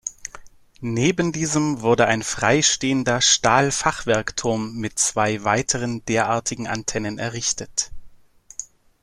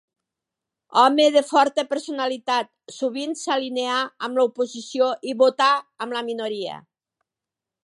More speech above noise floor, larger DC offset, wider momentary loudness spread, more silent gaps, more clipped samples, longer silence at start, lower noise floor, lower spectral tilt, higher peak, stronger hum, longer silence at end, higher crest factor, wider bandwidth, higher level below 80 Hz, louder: second, 28 dB vs 66 dB; neither; first, 15 LU vs 11 LU; neither; neither; second, 0.05 s vs 0.9 s; second, -49 dBFS vs -88 dBFS; about the same, -3 dB/octave vs -2.5 dB/octave; about the same, -2 dBFS vs -2 dBFS; neither; second, 0.4 s vs 1.05 s; about the same, 20 dB vs 20 dB; first, 13.5 kHz vs 11.5 kHz; first, -48 dBFS vs -80 dBFS; about the same, -20 LUFS vs -22 LUFS